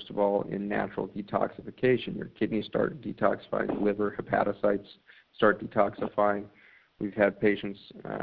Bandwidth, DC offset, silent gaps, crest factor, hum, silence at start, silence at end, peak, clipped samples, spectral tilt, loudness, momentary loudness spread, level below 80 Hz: 5.2 kHz; under 0.1%; none; 22 dB; none; 0 s; 0 s; -8 dBFS; under 0.1%; -10 dB/octave; -29 LUFS; 10 LU; -60 dBFS